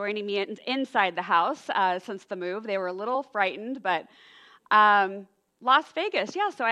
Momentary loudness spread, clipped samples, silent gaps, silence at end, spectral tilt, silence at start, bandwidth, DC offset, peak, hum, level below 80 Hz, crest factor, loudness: 12 LU; under 0.1%; none; 0 s; -4 dB/octave; 0 s; 11 kHz; under 0.1%; -6 dBFS; none; -82 dBFS; 20 dB; -26 LUFS